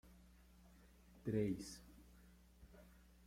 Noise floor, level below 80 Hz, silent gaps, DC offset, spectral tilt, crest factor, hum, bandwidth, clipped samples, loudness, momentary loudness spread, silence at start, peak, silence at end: -66 dBFS; -66 dBFS; none; under 0.1%; -6.5 dB/octave; 22 dB; none; 16.5 kHz; under 0.1%; -45 LUFS; 26 LU; 0.05 s; -28 dBFS; 0.25 s